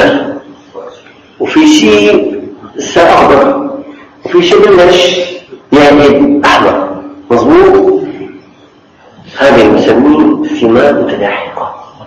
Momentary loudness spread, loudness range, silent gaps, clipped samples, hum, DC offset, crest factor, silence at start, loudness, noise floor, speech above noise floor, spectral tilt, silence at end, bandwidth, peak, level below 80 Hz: 20 LU; 2 LU; none; 3%; none; under 0.1%; 8 dB; 0 s; -7 LUFS; -40 dBFS; 35 dB; -4.5 dB/octave; 0 s; 10.5 kHz; 0 dBFS; -38 dBFS